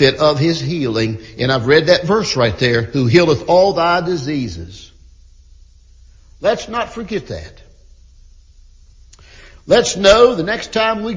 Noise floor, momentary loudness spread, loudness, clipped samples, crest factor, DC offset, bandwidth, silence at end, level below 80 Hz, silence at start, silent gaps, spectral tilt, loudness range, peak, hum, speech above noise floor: -44 dBFS; 13 LU; -15 LUFS; under 0.1%; 16 dB; under 0.1%; 7.6 kHz; 0 s; -40 dBFS; 0 s; none; -5 dB/octave; 11 LU; 0 dBFS; none; 30 dB